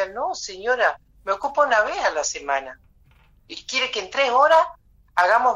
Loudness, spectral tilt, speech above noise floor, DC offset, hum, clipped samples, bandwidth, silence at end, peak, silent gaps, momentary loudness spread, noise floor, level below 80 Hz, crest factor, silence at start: -21 LUFS; -0.5 dB/octave; 34 dB; under 0.1%; none; under 0.1%; 10 kHz; 0 s; -6 dBFS; none; 11 LU; -55 dBFS; -56 dBFS; 16 dB; 0 s